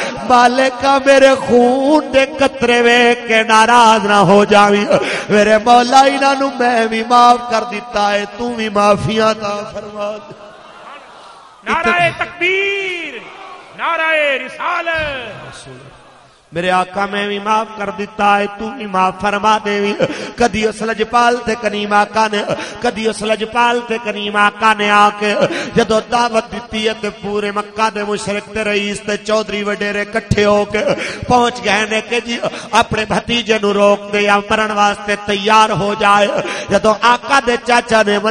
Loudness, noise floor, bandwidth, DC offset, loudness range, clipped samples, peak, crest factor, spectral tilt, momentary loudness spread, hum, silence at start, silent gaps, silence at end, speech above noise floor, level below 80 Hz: -13 LUFS; -44 dBFS; 11.5 kHz; under 0.1%; 8 LU; under 0.1%; 0 dBFS; 14 dB; -4 dB/octave; 11 LU; none; 0 s; none; 0 s; 31 dB; -44 dBFS